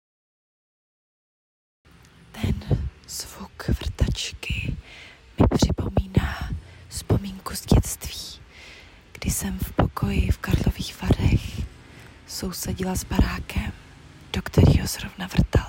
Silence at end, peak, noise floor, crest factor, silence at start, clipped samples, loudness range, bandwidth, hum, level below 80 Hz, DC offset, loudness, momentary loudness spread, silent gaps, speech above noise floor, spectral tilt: 0 s; -6 dBFS; -50 dBFS; 20 dB; 2.35 s; under 0.1%; 5 LU; 16.5 kHz; none; -32 dBFS; under 0.1%; -25 LUFS; 19 LU; none; 27 dB; -5.5 dB/octave